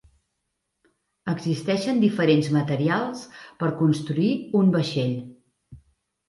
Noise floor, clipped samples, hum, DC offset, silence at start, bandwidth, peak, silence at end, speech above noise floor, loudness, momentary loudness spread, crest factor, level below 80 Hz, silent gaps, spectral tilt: -78 dBFS; under 0.1%; none; under 0.1%; 1.25 s; 11.5 kHz; -6 dBFS; 0.5 s; 56 dB; -23 LUFS; 11 LU; 18 dB; -62 dBFS; none; -7 dB/octave